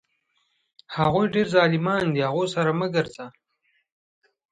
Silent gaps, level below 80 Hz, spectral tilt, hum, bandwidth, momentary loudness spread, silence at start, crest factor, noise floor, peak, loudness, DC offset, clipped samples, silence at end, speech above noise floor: none; -60 dBFS; -6.5 dB/octave; none; 9.2 kHz; 14 LU; 0.9 s; 20 dB; -71 dBFS; -6 dBFS; -23 LUFS; under 0.1%; under 0.1%; 1.25 s; 49 dB